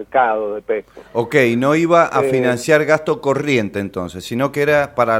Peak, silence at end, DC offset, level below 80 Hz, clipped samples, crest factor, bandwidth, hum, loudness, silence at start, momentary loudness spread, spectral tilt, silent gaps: 0 dBFS; 0 s; under 0.1%; -52 dBFS; under 0.1%; 16 dB; 16.5 kHz; none; -17 LUFS; 0 s; 11 LU; -5.5 dB/octave; none